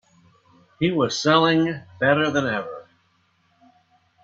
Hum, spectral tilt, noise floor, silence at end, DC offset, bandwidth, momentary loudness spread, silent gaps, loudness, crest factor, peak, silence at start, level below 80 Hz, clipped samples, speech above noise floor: none; -5 dB/octave; -64 dBFS; 1.4 s; under 0.1%; 7.8 kHz; 11 LU; none; -21 LUFS; 20 dB; -4 dBFS; 0.8 s; -62 dBFS; under 0.1%; 44 dB